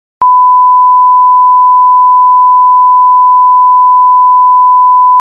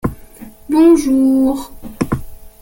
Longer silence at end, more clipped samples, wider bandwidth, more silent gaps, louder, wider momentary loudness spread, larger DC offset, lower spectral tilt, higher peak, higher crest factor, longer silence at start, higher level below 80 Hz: second, 0 s vs 0.15 s; neither; second, 1.6 kHz vs 17 kHz; neither; first, -4 LUFS vs -14 LUFS; second, 0 LU vs 14 LU; neither; second, -5 dB/octave vs -7 dB/octave; about the same, 0 dBFS vs -2 dBFS; second, 4 dB vs 14 dB; first, 0.2 s vs 0.05 s; second, -64 dBFS vs -36 dBFS